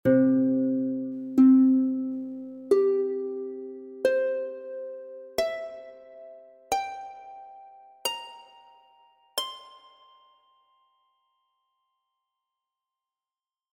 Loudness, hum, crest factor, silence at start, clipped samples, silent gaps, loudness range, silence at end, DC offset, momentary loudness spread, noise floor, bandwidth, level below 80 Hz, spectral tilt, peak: -26 LUFS; none; 18 dB; 0.05 s; under 0.1%; none; 17 LU; 4.05 s; under 0.1%; 24 LU; under -90 dBFS; 16.5 kHz; -68 dBFS; -5 dB/octave; -10 dBFS